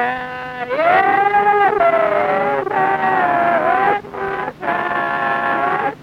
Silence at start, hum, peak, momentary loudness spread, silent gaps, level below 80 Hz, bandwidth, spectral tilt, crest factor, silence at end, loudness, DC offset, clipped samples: 0 s; none; -4 dBFS; 9 LU; none; -54 dBFS; 12.5 kHz; -6 dB/octave; 12 dB; 0 s; -16 LUFS; under 0.1%; under 0.1%